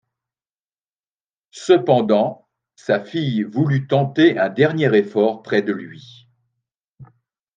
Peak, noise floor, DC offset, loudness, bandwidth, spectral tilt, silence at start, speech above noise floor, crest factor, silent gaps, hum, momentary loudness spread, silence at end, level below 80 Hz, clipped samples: -2 dBFS; under -90 dBFS; under 0.1%; -18 LUFS; 9.2 kHz; -7 dB/octave; 1.55 s; over 72 dB; 18 dB; 6.80-6.95 s; none; 11 LU; 0.5 s; -68 dBFS; under 0.1%